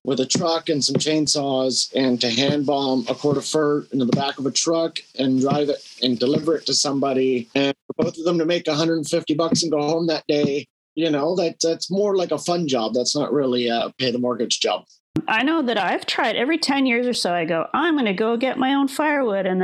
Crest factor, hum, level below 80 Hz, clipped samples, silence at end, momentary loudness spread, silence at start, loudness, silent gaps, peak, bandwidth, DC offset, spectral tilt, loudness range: 16 dB; none; -68 dBFS; under 0.1%; 0 s; 4 LU; 0.05 s; -21 LUFS; 7.82-7.89 s, 10.70-10.96 s, 15.00-15.14 s; -6 dBFS; 13 kHz; under 0.1%; -4 dB/octave; 1 LU